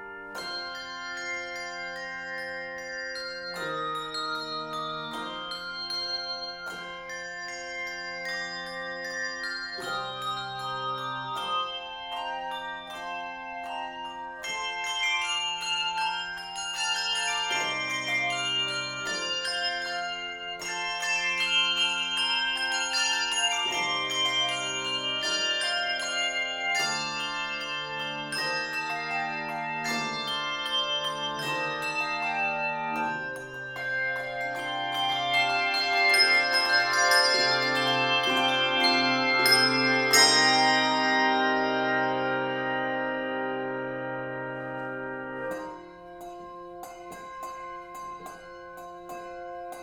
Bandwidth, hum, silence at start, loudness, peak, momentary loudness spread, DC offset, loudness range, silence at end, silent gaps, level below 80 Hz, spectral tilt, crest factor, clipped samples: 17 kHz; none; 0 s; -27 LUFS; -6 dBFS; 15 LU; under 0.1%; 13 LU; 0 s; none; -64 dBFS; -1.5 dB/octave; 22 dB; under 0.1%